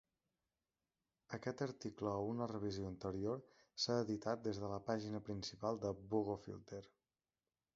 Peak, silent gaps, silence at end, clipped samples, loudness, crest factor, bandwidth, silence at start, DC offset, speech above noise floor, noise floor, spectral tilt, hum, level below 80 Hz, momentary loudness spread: -24 dBFS; none; 0.9 s; under 0.1%; -44 LUFS; 20 dB; 7.6 kHz; 1.3 s; under 0.1%; over 47 dB; under -90 dBFS; -5.5 dB/octave; none; -70 dBFS; 10 LU